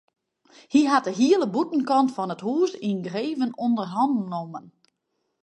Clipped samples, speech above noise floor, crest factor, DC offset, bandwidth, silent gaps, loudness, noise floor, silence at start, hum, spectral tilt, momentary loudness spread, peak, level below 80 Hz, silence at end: under 0.1%; 53 dB; 18 dB; under 0.1%; 9 kHz; none; -24 LUFS; -77 dBFS; 0.7 s; none; -5.5 dB/octave; 9 LU; -6 dBFS; -76 dBFS; 0.75 s